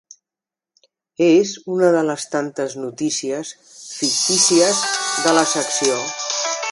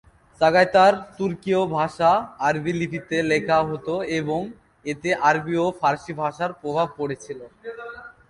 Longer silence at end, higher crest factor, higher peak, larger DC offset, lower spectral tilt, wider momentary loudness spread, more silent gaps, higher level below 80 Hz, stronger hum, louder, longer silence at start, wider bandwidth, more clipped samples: second, 0 s vs 0.2 s; about the same, 20 dB vs 18 dB; first, 0 dBFS vs -4 dBFS; neither; second, -2 dB/octave vs -5.5 dB/octave; second, 12 LU vs 18 LU; neither; second, -70 dBFS vs -56 dBFS; neither; first, -18 LUFS vs -22 LUFS; first, 1.2 s vs 0.4 s; about the same, 11.5 kHz vs 11 kHz; neither